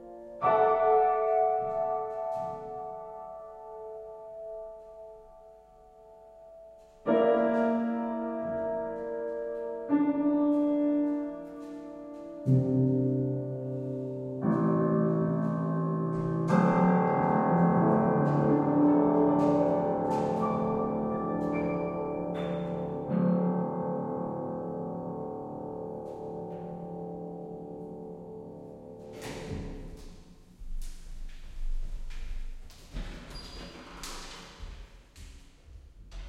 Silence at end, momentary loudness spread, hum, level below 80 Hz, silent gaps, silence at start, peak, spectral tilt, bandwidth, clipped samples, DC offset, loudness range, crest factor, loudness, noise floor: 0 s; 20 LU; none; -46 dBFS; none; 0 s; -14 dBFS; -8.5 dB/octave; 11.5 kHz; under 0.1%; under 0.1%; 19 LU; 16 dB; -29 LUFS; -55 dBFS